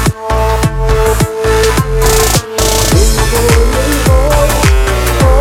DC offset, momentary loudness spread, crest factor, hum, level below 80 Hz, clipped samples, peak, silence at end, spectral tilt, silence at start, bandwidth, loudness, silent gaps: under 0.1%; 3 LU; 10 dB; none; -12 dBFS; under 0.1%; 0 dBFS; 0 s; -4.5 dB/octave; 0 s; 17 kHz; -10 LUFS; none